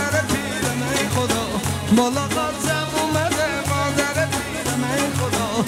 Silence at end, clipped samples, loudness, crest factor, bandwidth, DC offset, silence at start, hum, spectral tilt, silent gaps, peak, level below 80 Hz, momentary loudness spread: 0 s; under 0.1%; -21 LUFS; 16 dB; 16 kHz; under 0.1%; 0 s; none; -4 dB/octave; none; -6 dBFS; -44 dBFS; 4 LU